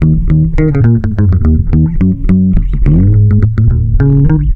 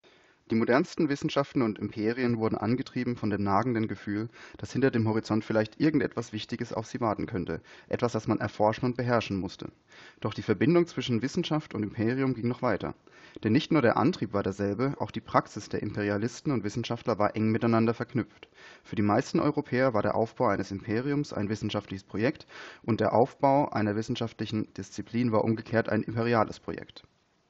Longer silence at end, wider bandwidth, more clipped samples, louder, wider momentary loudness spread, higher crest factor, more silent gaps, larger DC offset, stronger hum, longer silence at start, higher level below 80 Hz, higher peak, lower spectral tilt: second, 0 s vs 0.5 s; second, 3 kHz vs 8 kHz; neither; first, -10 LUFS vs -29 LUFS; second, 3 LU vs 11 LU; second, 8 dB vs 22 dB; neither; neither; neither; second, 0 s vs 0.5 s; first, -14 dBFS vs -62 dBFS; first, 0 dBFS vs -6 dBFS; first, -12 dB/octave vs -7 dB/octave